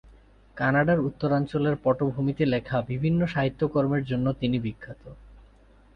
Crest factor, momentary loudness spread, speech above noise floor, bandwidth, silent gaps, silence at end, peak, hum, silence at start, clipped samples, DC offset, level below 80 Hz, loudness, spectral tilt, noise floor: 16 dB; 6 LU; 30 dB; 5.8 kHz; none; 0.55 s; -10 dBFS; none; 0.55 s; under 0.1%; under 0.1%; -50 dBFS; -26 LUFS; -9.5 dB/octave; -55 dBFS